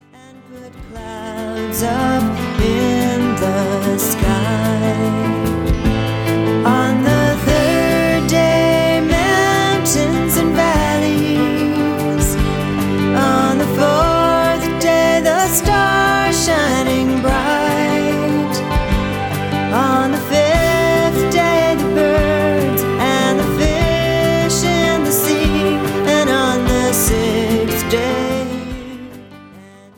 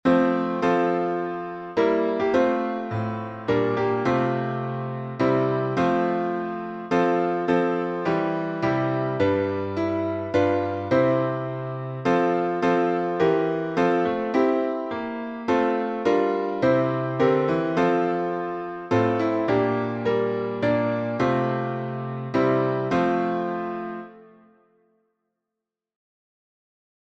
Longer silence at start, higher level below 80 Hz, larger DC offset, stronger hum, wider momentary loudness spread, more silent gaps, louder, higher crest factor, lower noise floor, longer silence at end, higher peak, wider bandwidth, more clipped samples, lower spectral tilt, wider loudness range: first, 0.5 s vs 0.05 s; first, -28 dBFS vs -60 dBFS; neither; neither; second, 5 LU vs 8 LU; neither; first, -15 LUFS vs -24 LUFS; about the same, 14 dB vs 18 dB; second, -41 dBFS vs -86 dBFS; second, 0.3 s vs 2.8 s; first, -2 dBFS vs -6 dBFS; first, 19 kHz vs 7.8 kHz; neither; second, -5 dB/octave vs -8 dB/octave; about the same, 3 LU vs 3 LU